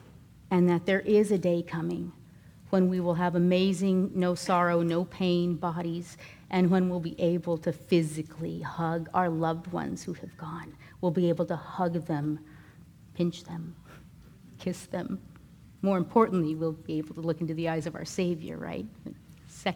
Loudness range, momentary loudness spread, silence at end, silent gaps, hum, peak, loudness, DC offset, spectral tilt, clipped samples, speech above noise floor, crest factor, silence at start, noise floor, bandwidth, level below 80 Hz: 7 LU; 15 LU; 0 s; none; none; -10 dBFS; -29 LUFS; under 0.1%; -7 dB/octave; under 0.1%; 24 dB; 20 dB; 0.05 s; -53 dBFS; 13 kHz; -60 dBFS